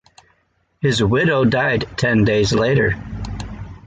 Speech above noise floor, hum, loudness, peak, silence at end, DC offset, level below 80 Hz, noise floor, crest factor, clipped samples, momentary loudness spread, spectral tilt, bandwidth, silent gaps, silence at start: 47 dB; none; -17 LUFS; -4 dBFS; 0.1 s; under 0.1%; -36 dBFS; -64 dBFS; 14 dB; under 0.1%; 14 LU; -6 dB/octave; 9.4 kHz; none; 0.8 s